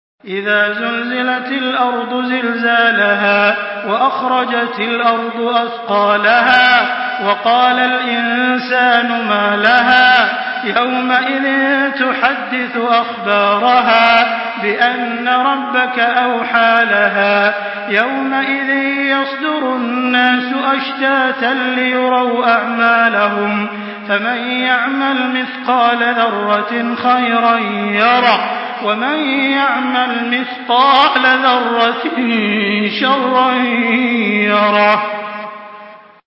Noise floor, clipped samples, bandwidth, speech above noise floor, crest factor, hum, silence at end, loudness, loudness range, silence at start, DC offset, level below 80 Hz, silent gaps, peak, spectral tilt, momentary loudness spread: -37 dBFS; under 0.1%; 5.8 kHz; 24 dB; 14 dB; none; 0.3 s; -13 LUFS; 3 LU; 0.25 s; under 0.1%; -62 dBFS; none; 0 dBFS; -6 dB/octave; 7 LU